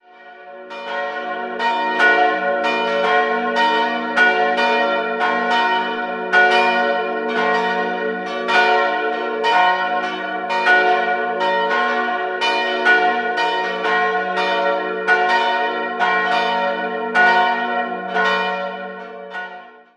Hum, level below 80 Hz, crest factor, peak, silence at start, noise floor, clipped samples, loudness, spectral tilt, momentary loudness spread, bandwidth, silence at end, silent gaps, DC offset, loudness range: none; -70 dBFS; 16 dB; -2 dBFS; 0.2 s; -41 dBFS; under 0.1%; -17 LUFS; -3.5 dB/octave; 10 LU; 10.5 kHz; 0.25 s; none; under 0.1%; 2 LU